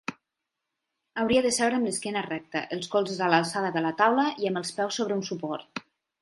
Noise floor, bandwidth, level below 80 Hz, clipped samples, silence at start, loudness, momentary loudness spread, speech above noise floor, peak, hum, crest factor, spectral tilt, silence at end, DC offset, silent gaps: -85 dBFS; 11.5 kHz; -66 dBFS; under 0.1%; 0.1 s; -27 LUFS; 11 LU; 58 dB; -4 dBFS; none; 24 dB; -4 dB/octave; 0.4 s; under 0.1%; none